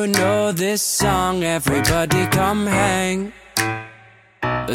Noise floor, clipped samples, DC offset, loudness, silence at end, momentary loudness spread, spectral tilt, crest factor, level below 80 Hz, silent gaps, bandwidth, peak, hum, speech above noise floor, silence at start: -48 dBFS; under 0.1%; under 0.1%; -19 LUFS; 0 s; 7 LU; -4 dB/octave; 18 dB; -40 dBFS; none; 17 kHz; -2 dBFS; none; 29 dB; 0 s